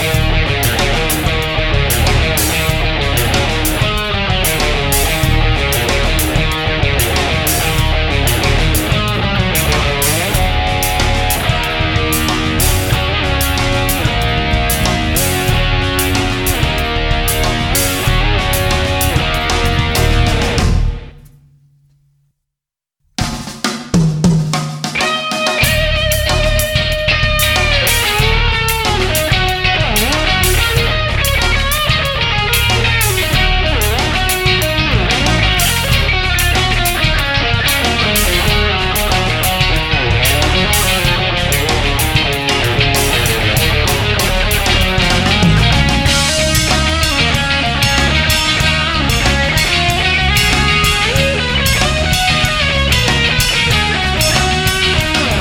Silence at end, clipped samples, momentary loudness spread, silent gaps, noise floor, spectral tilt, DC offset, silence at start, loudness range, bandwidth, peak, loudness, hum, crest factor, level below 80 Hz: 0 s; under 0.1%; 3 LU; none; -83 dBFS; -3.5 dB/octave; under 0.1%; 0 s; 3 LU; 19.5 kHz; 0 dBFS; -13 LUFS; none; 12 dB; -20 dBFS